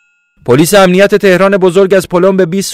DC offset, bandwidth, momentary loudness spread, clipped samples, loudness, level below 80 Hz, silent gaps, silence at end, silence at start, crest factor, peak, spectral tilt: under 0.1%; 16 kHz; 5 LU; 2%; -7 LUFS; -42 dBFS; none; 0 s; 0.45 s; 8 dB; 0 dBFS; -5 dB/octave